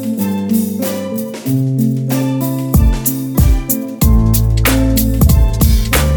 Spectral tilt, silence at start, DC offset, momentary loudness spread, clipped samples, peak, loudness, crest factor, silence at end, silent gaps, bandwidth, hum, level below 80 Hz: -6 dB/octave; 0 s; under 0.1%; 6 LU; under 0.1%; 0 dBFS; -14 LUFS; 12 dB; 0 s; none; over 20 kHz; none; -16 dBFS